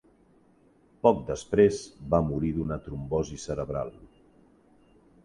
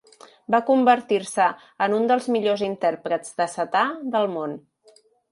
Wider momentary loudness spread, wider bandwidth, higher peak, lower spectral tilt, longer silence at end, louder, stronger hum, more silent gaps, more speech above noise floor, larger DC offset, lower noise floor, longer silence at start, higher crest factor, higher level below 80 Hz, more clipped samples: first, 12 LU vs 9 LU; about the same, 11 kHz vs 11.5 kHz; about the same, -6 dBFS vs -4 dBFS; first, -7 dB/octave vs -4.5 dB/octave; first, 1.2 s vs 0.75 s; second, -28 LUFS vs -22 LUFS; neither; neither; about the same, 34 dB vs 35 dB; neither; first, -61 dBFS vs -57 dBFS; first, 1.05 s vs 0.5 s; first, 24 dB vs 18 dB; first, -48 dBFS vs -74 dBFS; neither